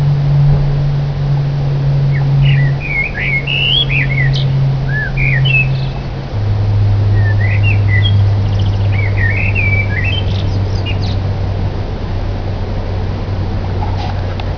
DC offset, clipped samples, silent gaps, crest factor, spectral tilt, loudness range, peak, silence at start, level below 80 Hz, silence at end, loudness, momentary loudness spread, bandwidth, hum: 1%; under 0.1%; none; 12 dB; -7.5 dB/octave; 6 LU; 0 dBFS; 0 s; -22 dBFS; 0 s; -14 LUFS; 9 LU; 5.4 kHz; none